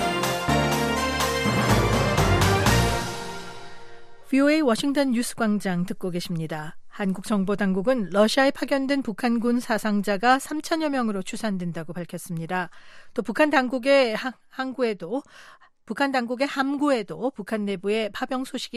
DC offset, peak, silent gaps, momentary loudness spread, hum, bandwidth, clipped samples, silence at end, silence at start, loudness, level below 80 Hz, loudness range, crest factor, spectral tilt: under 0.1%; -6 dBFS; none; 13 LU; none; 14.5 kHz; under 0.1%; 0 s; 0 s; -24 LUFS; -42 dBFS; 4 LU; 18 dB; -5 dB/octave